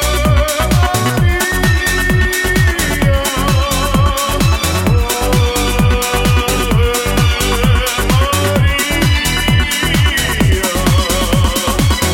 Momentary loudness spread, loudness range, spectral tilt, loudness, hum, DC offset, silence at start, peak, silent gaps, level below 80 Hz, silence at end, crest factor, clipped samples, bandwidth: 1 LU; 1 LU; -4 dB/octave; -13 LUFS; none; under 0.1%; 0 s; 0 dBFS; none; -18 dBFS; 0 s; 12 dB; under 0.1%; 17 kHz